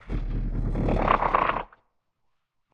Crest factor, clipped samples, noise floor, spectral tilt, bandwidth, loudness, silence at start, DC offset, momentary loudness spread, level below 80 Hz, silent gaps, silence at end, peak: 24 dB; under 0.1%; -76 dBFS; -8.5 dB/octave; 5.6 kHz; -26 LUFS; 0.05 s; under 0.1%; 11 LU; -32 dBFS; none; 1.1 s; -4 dBFS